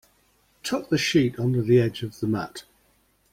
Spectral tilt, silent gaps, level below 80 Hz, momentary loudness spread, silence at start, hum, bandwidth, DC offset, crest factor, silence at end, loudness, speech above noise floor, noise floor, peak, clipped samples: -6 dB/octave; none; -56 dBFS; 14 LU; 0.65 s; none; 16 kHz; under 0.1%; 18 dB; 0.7 s; -24 LUFS; 41 dB; -64 dBFS; -8 dBFS; under 0.1%